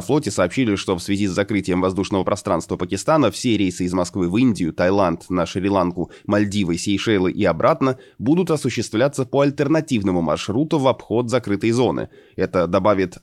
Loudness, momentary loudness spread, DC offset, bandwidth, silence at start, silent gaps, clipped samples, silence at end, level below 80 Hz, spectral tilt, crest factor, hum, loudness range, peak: -20 LUFS; 5 LU; under 0.1%; 13 kHz; 0 s; none; under 0.1%; 0.1 s; -50 dBFS; -6 dB/octave; 16 dB; none; 1 LU; -4 dBFS